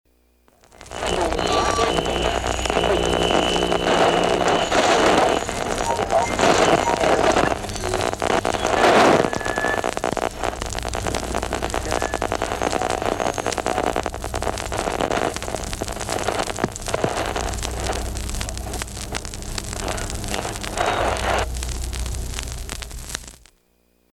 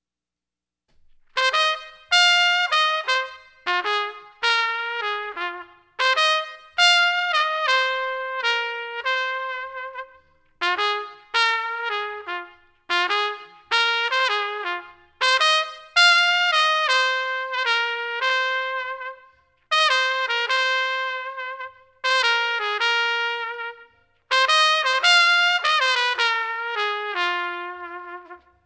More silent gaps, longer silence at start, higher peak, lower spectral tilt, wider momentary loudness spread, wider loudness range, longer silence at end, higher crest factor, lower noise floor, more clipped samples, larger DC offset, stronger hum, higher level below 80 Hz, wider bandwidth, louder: neither; second, 0.8 s vs 1.35 s; about the same, -4 dBFS vs -2 dBFS; first, -3.5 dB/octave vs 1.5 dB/octave; second, 12 LU vs 15 LU; about the same, 8 LU vs 6 LU; first, 0.85 s vs 0.3 s; about the same, 18 dB vs 20 dB; second, -62 dBFS vs -89 dBFS; neither; neither; neither; first, -34 dBFS vs -70 dBFS; first, 17.5 kHz vs 8 kHz; about the same, -22 LUFS vs -20 LUFS